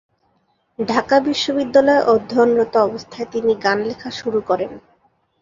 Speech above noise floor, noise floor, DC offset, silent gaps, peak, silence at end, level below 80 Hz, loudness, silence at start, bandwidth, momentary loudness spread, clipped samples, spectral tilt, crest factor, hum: 47 dB; -64 dBFS; under 0.1%; none; -2 dBFS; 0.6 s; -58 dBFS; -18 LUFS; 0.8 s; 7.6 kHz; 12 LU; under 0.1%; -4.5 dB/octave; 18 dB; none